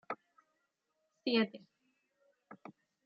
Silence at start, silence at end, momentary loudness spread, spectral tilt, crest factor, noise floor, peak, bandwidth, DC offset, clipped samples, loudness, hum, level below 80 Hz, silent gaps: 0.1 s; 0.5 s; 24 LU; -2.5 dB/octave; 24 dB; -83 dBFS; -18 dBFS; 5.4 kHz; under 0.1%; under 0.1%; -36 LUFS; none; under -90 dBFS; none